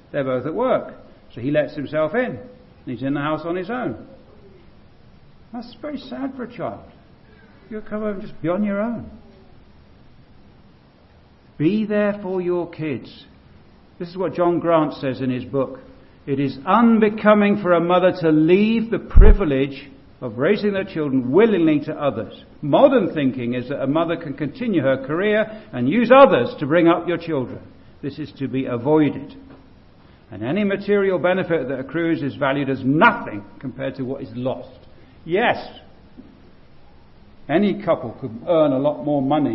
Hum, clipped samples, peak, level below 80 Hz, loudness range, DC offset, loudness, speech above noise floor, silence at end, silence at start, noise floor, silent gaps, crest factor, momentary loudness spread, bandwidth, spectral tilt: none; under 0.1%; 0 dBFS; -30 dBFS; 12 LU; under 0.1%; -20 LUFS; 31 dB; 0 s; 0.15 s; -50 dBFS; none; 20 dB; 17 LU; 5.8 kHz; -10.5 dB/octave